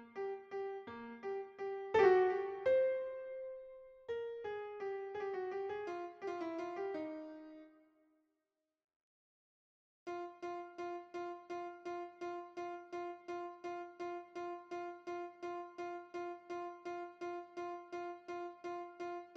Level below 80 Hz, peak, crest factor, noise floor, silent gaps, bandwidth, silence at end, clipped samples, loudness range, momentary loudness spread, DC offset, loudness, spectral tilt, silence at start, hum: -80 dBFS; -18 dBFS; 24 dB; -89 dBFS; 8.84-8.88 s, 8.96-10.06 s; 7.2 kHz; 0 s; under 0.1%; 14 LU; 12 LU; under 0.1%; -42 LUFS; -5.5 dB/octave; 0 s; none